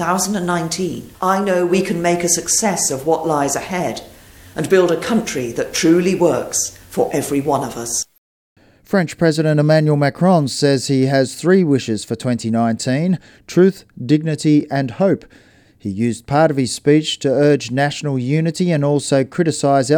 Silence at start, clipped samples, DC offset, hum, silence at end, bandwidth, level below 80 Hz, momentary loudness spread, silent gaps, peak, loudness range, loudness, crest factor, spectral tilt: 0 s; under 0.1%; under 0.1%; none; 0 s; 18.5 kHz; -52 dBFS; 8 LU; 8.18-8.56 s; -2 dBFS; 3 LU; -17 LUFS; 16 dB; -5 dB/octave